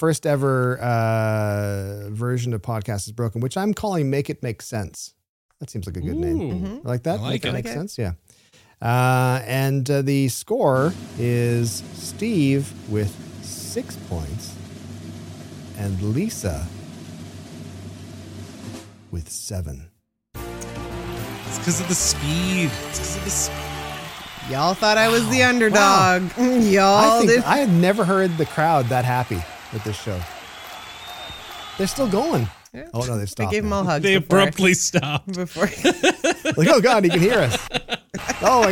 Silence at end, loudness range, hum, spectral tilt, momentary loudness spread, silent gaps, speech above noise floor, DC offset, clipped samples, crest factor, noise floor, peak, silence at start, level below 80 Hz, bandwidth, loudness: 0 s; 13 LU; none; -4.5 dB/octave; 20 LU; 5.29-5.49 s; 24 dB; under 0.1%; under 0.1%; 20 dB; -44 dBFS; -2 dBFS; 0 s; -44 dBFS; 17 kHz; -21 LUFS